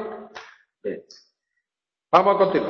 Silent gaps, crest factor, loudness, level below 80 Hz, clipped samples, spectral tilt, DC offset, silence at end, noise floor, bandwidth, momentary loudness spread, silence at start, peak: none; 22 dB; -20 LUFS; -66 dBFS; under 0.1%; -6.5 dB/octave; under 0.1%; 0 s; -89 dBFS; 6.8 kHz; 23 LU; 0 s; -2 dBFS